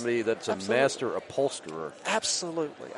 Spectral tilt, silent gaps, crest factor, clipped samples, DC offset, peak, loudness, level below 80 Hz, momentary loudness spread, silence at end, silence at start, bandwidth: -3 dB/octave; none; 18 dB; under 0.1%; under 0.1%; -10 dBFS; -29 LUFS; -74 dBFS; 9 LU; 0 s; 0 s; 11.5 kHz